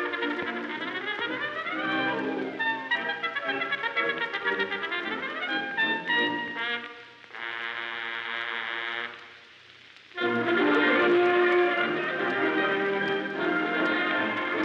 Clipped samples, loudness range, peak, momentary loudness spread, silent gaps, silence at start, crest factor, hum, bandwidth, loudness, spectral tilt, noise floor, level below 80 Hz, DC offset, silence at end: under 0.1%; 8 LU; -12 dBFS; 10 LU; none; 0 s; 16 dB; none; 7.2 kHz; -27 LUFS; -5.5 dB/octave; -51 dBFS; -78 dBFS; under 0.1%; 0 s